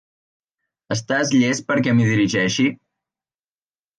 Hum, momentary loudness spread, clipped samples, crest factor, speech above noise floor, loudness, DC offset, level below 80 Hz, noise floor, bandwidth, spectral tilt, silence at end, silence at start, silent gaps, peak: none; 5 LU; under 0.1%; 16 dB; over 72 dB; -19 LUFS; under 0.1%; -58 dBFS; under -90 dBFS; 9.8 kHz; -5 dB/octave; 1.25 s; 0.9 s; none; -6 dBFS